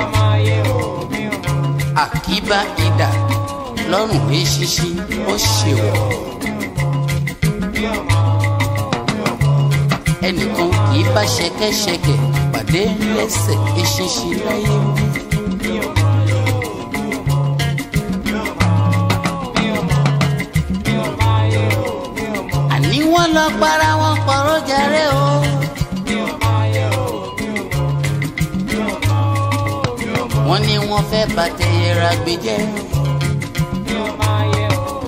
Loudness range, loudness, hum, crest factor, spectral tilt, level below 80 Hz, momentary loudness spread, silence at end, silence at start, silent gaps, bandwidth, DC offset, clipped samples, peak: 3 LU; -17 LUFS; none; 14 dB; -5 dB/octave; -34 dBFS; 6 LU; 0 s; 0 s; none; 16 kHz; under 0.1%; under 0.1%; -2 dBFS